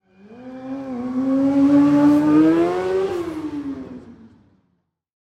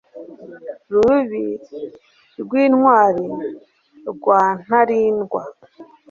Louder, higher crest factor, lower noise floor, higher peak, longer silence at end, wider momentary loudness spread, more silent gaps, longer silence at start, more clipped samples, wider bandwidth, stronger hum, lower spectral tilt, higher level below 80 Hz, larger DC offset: about the same, -18 LUFS vs -17 LUFS; about the same, 14 dB vs 18 dB; first, -69 dBFS vs -44 dBFS; second, -6 dBFS vs -2 dBFS; first, 1.1 s vs 0.3 s; about the same, 20 LU vs 22 LU; neither; first, 0.3 s vs 0.15 s; neither; first, 8.4 kHz vs 7.2 kHz; neither; about the same, -7.5 dB/octave vs -7.5 dB/octave; about the same, -56 dBFS vs -58 dBFS; neither